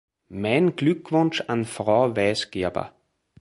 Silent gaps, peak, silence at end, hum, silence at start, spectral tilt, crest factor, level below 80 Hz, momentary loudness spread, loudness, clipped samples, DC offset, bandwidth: none; -6 dBFS; 0.5 s; none; 0.3 s; -6 dB/octave; 18 dB; -56 dBFS; 10 LU; -23 LUFS; under 0.1%; under 0.1%; 11.5 kHz